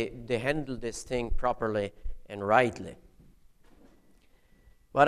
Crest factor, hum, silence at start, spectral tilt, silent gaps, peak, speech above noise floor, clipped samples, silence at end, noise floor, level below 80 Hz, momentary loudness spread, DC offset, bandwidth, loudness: 22 dB; none; 0 s; -5.5 dB/octave; none; -8 dBFS; 31 dB; under 0.1%; 0 s; -61 dBFS; -42 dBFS; 18 LU; under 0.1%; 12.5 kHz; -30 LUFS